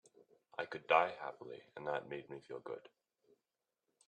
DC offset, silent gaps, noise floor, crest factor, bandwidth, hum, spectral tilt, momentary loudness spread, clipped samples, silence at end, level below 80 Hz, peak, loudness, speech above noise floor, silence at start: under 0.1%; none; under -90 dBFS; 28 dB; 9.6 kHz; none; -5 dB/octave; 18 LU; under 0.1%; 1.3 s; -88 dBFS; -14 dBFS; -39 LUFS; over 50 dB; 0.6 s